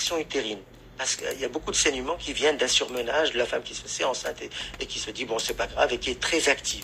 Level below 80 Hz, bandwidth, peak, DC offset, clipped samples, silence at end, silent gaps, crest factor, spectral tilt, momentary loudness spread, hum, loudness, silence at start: -48 dBFS; 16 kHz; -6 dBFS; under 0.1%; under 0.1%; 0 s; none; 22 dB; -1 dB/octave; 10 LU; none; -26 LUFS; 0 s